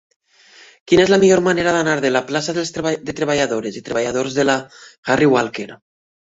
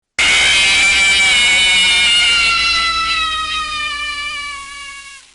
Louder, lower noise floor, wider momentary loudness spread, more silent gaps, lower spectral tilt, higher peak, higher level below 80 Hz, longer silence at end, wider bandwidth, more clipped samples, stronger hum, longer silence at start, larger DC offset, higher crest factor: second, -17 LUFS vs -11 LUFS; first, -47 dBFS vs -34 dBFS; second, 11 LU vs 15 LU; first, 4.98-5.03 s vs none; first, -4.5 dB/octave vs 1 dB/octave; first, 0 dBFS vs -6 dBFS; second, -52 dBFS vs -38 dBFS; first, 0.65 s vs 0.15 s; second, 8 kHz vs 11.5 kHz; neither; neither; first, 0.85 s vs 0.2 s; neither; first, 18 dB vs 10 dB